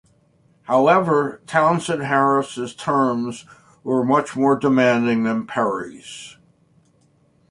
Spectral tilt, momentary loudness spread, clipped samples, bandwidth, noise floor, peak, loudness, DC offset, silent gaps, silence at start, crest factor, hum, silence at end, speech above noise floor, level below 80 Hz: -6 dB/octave; 18 LU; under 0.1%; 11.5 kHz; -59 dBFS; -2 dBFS; -19 LUFS; under 0.1%; none; 0.7 s; 18 dB; none; 1.2 s; 40 dB; -62 dBFS